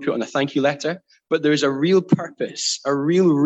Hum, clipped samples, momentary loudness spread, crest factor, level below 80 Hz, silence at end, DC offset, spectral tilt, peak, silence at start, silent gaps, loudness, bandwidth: none; under 0.1%; 9 LU; 16 dB; -68 dBFS; 0 s; under 0.1%; -5 dB/octave; -4 dBFS; 0 s; none; -20 LUFS; 8.6 kHz